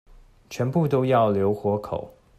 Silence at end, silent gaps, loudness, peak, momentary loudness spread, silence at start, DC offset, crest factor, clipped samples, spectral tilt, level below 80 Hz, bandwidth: 0.3 s; none; -23 LUFS; -8 dBFS; 13 LU; 0.5 s; under 0.1%; 16 dB; under 0.1%; -8 dB/octave; -54 dBFS; 14 kHz